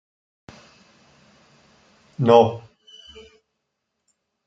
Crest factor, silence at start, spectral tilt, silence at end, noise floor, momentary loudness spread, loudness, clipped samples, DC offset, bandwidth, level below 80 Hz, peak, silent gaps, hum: 24 dB; 2.2 s; -7.5 dB/octave; 1.9 s; -78 dBFS; 28 LU; -17 LUFS; under 0.1%; under 0.1%; 7.8 kHz; -64 dBFS; -2 dBFS; none; none